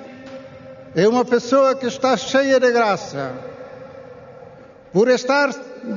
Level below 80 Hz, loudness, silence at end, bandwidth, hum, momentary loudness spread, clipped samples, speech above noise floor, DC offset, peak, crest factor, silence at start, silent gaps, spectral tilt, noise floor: -64 dBFS; -18 LUFS; 0 s; 7.4 kHz; none; 22 LU; under 0.1%; 25 dB; under 0.1%; -4 dBFS; 16 dB; 0 s; none; -3.5 dB/octave; -42 dBFS